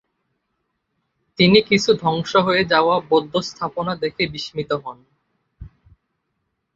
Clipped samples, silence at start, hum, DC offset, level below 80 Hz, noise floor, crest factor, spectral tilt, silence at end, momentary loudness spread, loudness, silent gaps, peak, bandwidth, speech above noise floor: under 0.1%; 1.4 s; none; under 0.1%; -52 dBFS; -74 dBFS; 20 dB; -5 dB/octave; 1.1 s; 12 LU; -19 LUFS; none; -2 dBFS; 7.8 kHz; 55 dB